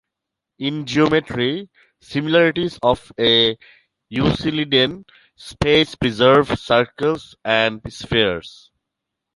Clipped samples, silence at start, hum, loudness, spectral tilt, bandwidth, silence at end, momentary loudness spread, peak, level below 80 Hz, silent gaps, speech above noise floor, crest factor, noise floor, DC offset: under 0.1%; 0.6 s; none; -18 LUFS; -5.5 dB/octave; 11.5 kHz; 0.85 s; 13 LU; -2 dBFS; -44 dBFS; none; 64 dB; 18 dB; -83 dBFS; under 0.1%